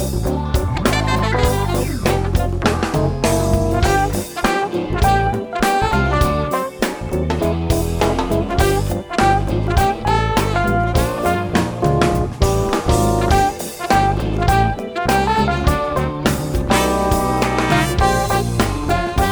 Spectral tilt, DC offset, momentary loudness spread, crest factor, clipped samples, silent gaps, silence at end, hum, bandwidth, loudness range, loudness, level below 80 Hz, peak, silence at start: -5.5 dB/octave; under 0.1%; 4 LU; 16 dB; under 0.1%; none; 0 s; none; over 20 kHz; 1 LU; -18 LUFS; -24 dBFS; 0 dBFS; 0 s